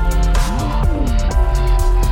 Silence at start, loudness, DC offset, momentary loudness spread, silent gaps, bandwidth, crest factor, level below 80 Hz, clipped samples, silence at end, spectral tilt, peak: 0 s; -18 LUFS; under 0.1%; 2 LU; none; 15 kHz; 10 dB; -14 dBFS; under 0.1%; 0 s; -6 dB/octave; -4 dBFS